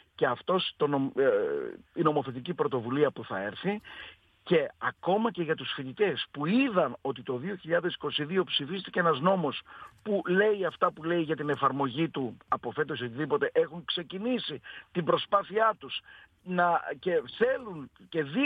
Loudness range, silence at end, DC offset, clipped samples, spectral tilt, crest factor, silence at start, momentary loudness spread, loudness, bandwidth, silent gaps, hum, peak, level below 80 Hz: 2 LU; 0 s; under 0.1%; under 0.1%; -8 dB/octave; 18 dB; 0.2 s; 10 LU; -30 LUFS; 5 kHz; none; none; -12 dBFS; -70 dBFS